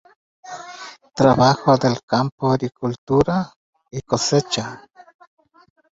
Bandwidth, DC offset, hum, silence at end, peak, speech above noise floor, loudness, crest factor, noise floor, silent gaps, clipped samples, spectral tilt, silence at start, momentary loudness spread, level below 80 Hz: 8 kHz; under 0.1%; none; 1.2 s; -2 dBFS; 21 dB; -19 LUFS; 20 dB; -39 dBFS; 2.03-2.08 s, 2.32-2.38 s, 2.98-3.07 s, 3.56-3.73 s; under 0.1%; -5.5 dB/octave; 0.45 s; 20 LU; -50 dBFS